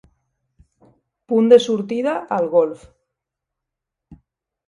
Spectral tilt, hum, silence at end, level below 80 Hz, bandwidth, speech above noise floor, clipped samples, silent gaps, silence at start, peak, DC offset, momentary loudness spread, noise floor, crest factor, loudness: -6 dB/octave; none; 1.9 s; -60 dBFS; 10.5 kHz; 66 dB; under 0.1%; none; 1.3 s; 0 dBFS; under 0.1%; 10 LU; -83 dBFS; 20 dB; -17 LUFS